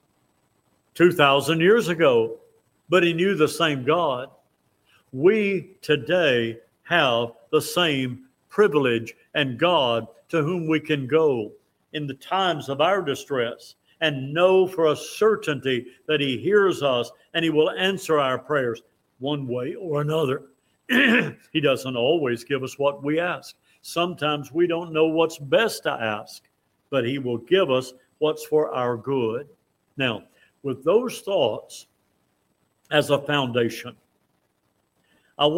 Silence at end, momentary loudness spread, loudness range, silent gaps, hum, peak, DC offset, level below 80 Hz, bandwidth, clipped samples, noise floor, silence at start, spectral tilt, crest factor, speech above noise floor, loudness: 0 s; 12 LU; 4 LU; none; none; -2 dBFS; under 0.1%; -68 dBFS; 16.5 kHz; under 0.1%; -70 dBFS; 0.95 s; -5 dB/octave; 22 dB; 48 dB; -23 LUFS